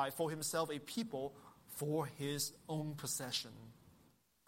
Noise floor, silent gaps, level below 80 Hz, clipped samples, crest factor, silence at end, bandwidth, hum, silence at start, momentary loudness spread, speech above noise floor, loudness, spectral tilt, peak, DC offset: -71 dBFS; none; -76 dBFS; under 0.1%; 20 dB; 0.55 s; 16.5 kHz; none; 0 s; 13 LU; 30 dB; -41 LUFS; -4 dB/octave; -24 dBFS; under 0.1%